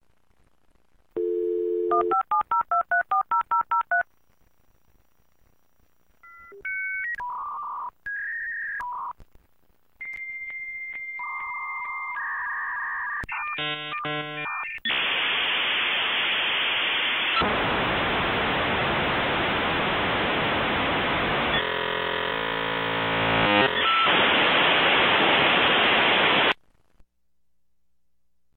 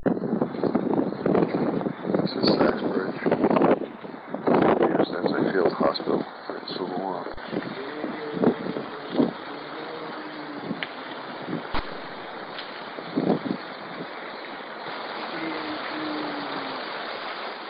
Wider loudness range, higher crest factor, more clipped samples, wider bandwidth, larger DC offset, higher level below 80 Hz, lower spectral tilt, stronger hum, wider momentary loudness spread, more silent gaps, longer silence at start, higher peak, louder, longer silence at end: first, 14 LU vs 9 LU; about the same, 18 dB vs 18 dB; neither; first, 16 kHz vs 5.4 kHz; neither; about the same, -52 dBFS vs -52 dBFS; second, -6 dB/octave vs -9 dB/octave; neither; about the same, 14 LU vs 14 LU; neither; first, 1.15 s vs 0 s; about the same, -8 dBFS vs -8 dBFS; first, -23 LUFS vs -27 LUFS; first, 2.05 s vs 0 s